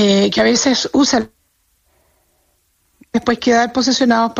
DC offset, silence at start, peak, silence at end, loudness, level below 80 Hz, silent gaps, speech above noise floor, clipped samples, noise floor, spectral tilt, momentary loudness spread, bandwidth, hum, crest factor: under 0.1%; 0 s; -2 dBFS; 0 s; -14 LUFS; -50 dBFS; none; 47 dB; under 0.1%; -62 dBFS; -3.5 dB/octave; 7 LU; 8.2 kHz; none; 14 dB